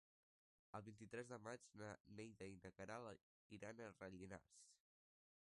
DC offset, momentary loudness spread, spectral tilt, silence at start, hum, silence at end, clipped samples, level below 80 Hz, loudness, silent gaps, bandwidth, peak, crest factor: under 0.1%; 6 LU; -5.5 dB/octave; 0.75 s; none; 0.65 s; under 0.1%; -82 dBFS; -58 LUFS; 2.00-2.05 s, 3.23-3.50 s; 11 kHz; -40 dBFS; 20 dB